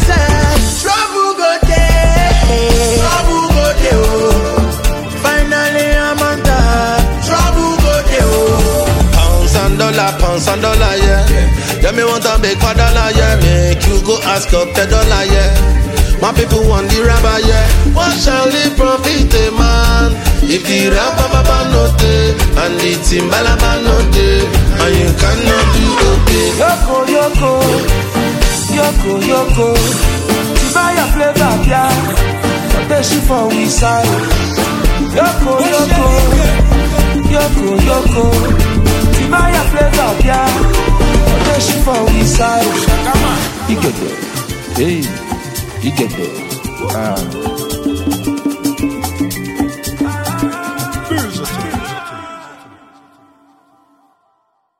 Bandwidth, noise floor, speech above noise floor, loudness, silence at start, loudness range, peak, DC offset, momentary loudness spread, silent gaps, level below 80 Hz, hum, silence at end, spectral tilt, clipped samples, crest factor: 17 kHz; -61 dBFS; 51 dB; -12 LUFS; 0 s; 7 LU; 0 dBFS; under 0.1%; 7 LU; none; -14 dBFS; none; 2.25 s; -4.5 dB/octave; under 0.1%; 10 dB